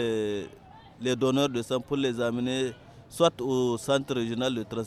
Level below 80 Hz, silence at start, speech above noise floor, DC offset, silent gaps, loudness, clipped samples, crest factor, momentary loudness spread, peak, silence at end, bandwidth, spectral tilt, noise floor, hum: -60 dBFS; 0 s; 23 dB; under 0.1%; none; -28 LUFS; under 0.1%; 22 dB; 9 LU; -8 dBFS; 0 s; 15 kHz; -5 dB/octave; -50 dBFS; none